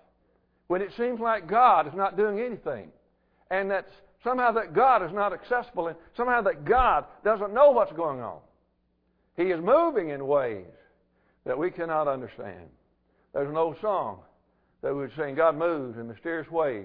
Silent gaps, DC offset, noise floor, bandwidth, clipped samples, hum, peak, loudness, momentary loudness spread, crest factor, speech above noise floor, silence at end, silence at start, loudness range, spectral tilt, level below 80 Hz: none; under 0.1%; -71 dBFS; 5 kHz; under 0.1%; none; -6 dBFS; -26 LUFS; 15 LU; 20 dB; 45 dB; 0 s; 0.7 s; 7 LU; -9.5 dB/octave; -52 dBFS